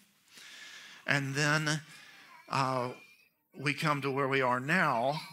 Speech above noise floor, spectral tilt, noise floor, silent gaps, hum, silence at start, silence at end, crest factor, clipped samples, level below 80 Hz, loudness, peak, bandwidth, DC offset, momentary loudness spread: 33 dB; -4.5 dB/octave; -64 dBFS; none; none; 0.35 s; 0 s; 24 dB; under 0.1%; -76 dBFS; -31 LUFS; -10 dBFS; 16 kHz; under 0.1%; 20 LU